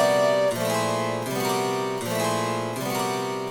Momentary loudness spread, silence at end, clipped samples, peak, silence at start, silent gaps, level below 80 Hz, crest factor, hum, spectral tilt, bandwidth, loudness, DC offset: 6 LU; 0 s; under 0.1%; -10 dBFS; 0 s; none; -64 dBFS; 16 dB; none; -4 dB/octave; 19.5 kHz; -25 LUFS; under 0.1%